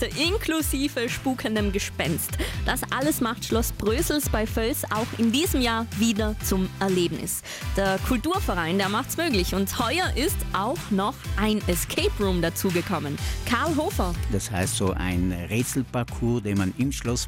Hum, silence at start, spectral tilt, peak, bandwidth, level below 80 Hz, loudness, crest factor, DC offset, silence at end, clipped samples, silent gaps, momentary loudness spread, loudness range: none; 0 s; -4.5 dB/octave; -12 dBFS; 17 kHz; -34 dBFS; -25 LUFS; 12 dB; under 0.1%; 0 s; under 0.1%; none; 4 LU; 2 LU